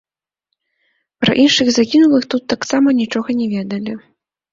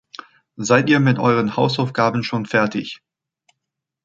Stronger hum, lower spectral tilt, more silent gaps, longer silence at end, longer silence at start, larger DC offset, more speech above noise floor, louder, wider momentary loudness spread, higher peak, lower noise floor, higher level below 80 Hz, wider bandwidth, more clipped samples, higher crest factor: neither; second, -4 dB/octave vs -5.5 dB/octave; neither; second, 0.55 s vs 1.1 s; first, 1.2 s vs 0.6 s; neither; about the same, 62 dB vs 64 dB; first, -15 LUFS vs -18 LUFS; second, 12 LU vs 19 LU; about the same, -2 dBFS vs -2 dBFS; second, -76 dBFS vs -81 dBFS; first, -54 dBFS vs -60 dBFS; about the same, 7.8 kHz vs 7.8 kHz; neither; about the same, 14 dB vs 18 dB